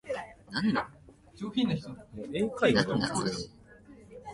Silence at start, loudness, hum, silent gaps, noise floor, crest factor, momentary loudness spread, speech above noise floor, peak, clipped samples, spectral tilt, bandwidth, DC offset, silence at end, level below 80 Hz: 0.05 s; -30 LUFS; none; none; -53 dBFS; 22 dB; 19 LU; 24 dB; -10 dBFS; under 0.1%; -5 dB/octave; 11.5 kHz; under 0.1%; 0 s; -58 dBFS